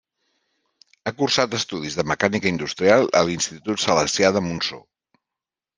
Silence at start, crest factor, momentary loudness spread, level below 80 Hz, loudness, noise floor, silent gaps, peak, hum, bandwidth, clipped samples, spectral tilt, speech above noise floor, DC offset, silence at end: 1.05 s; 20 dB; 9 LU; -58 dBFS; -21 LUFS; -88 dBFS; none; -2 dBFS; none; 10.5 kHz; under 0.1%; -3.5 dB/octave; 67 dB; under 0.1%; 1 s